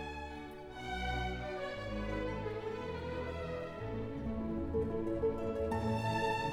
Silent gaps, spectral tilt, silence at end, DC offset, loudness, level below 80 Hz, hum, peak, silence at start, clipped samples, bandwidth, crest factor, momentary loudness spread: none; -6.5 dB/octave; 0 s; under 0.1%; -39 LUFS; -48 dBFS; none; -22 dBFS; 0 s; under 0.1%; 15 kHz; 14 dB; 8 LU